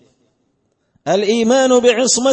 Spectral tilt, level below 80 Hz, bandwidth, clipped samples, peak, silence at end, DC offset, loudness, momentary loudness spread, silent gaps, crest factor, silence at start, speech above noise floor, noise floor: -2.5 dB/octave; -60 dBFS; 8.8 kHz; under 0.1%; -2 dBFS; 0 s; under 0.1%; -13 LUFS; 7 LU; none; 14 dB; 1.05 s; 52 dB; -65 dBFS